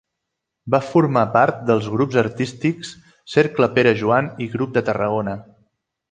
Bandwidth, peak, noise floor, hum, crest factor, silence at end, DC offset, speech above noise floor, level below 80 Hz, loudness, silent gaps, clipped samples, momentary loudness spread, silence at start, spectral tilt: 9.4 kHz; -2 dBFS; -80 dBFS; none; 18 dB; 0.7 s; under 0.1%; 61 dB; -56 dBFS; -19 LUFS; none; under 0.1%; 10 LU; 0.65 s; -7 dB/octave